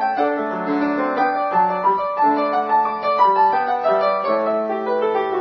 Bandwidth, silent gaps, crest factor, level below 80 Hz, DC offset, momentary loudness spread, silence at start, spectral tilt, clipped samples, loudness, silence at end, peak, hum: 6.4 kHz; none; 14 dB; -64 dBFS; under 0.1%; 4 LU; 0 s; -7 dB/octave; under 0.1%; -19 LUFS; 0 s; -4 dBFS; none